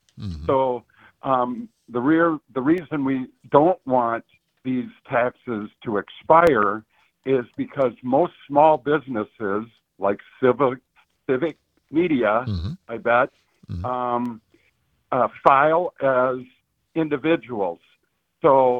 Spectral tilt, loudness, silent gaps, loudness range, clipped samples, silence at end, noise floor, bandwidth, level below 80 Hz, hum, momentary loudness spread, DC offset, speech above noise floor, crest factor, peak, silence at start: -8.5 dB/octave; -22 LUFS; none; 3 LU; under 0.1%; 0 s; -68 dBFS; 7.4 kHz; -54 dBFS; none; 14 LU; under 0.1%; 47 dB; 22 dB; 0 dBFS; 0.15 s